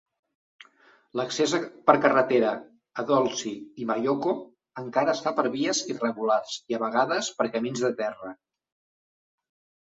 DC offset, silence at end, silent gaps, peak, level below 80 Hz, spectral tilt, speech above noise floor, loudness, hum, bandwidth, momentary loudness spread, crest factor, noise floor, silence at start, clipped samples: under 0.1%; 1.55 s; none; -2 dBFS; -72 dBFS; -4 dB/octave; 34 dB; -26 LUFS; none; 8.2 kHz; 14 LU; 24 dB; -59 dBFS; 1.15 s; under 0.1%